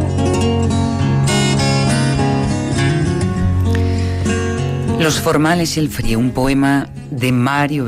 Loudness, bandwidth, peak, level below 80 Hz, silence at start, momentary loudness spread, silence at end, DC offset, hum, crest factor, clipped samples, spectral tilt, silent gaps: -16 LUFS; 16 kHz; -4 dBFS; -32 dBFS; 0 s; 4 LU; 0 s; under 0.1%; none; 12 dB; under 0.1%; -5.5 dB/octave; none